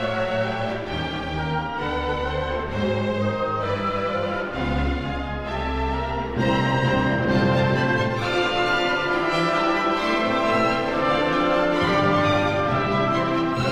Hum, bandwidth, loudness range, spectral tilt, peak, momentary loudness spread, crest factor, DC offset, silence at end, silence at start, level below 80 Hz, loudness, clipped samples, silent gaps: none; 12 kHz; 5 LU; -6.5 dB/octave; -8 dBFS; 6 LU; 16 dB; under 0.1%; 0 s; 0 s; -36 dBFS; -22 LUFS; under 0.1%; none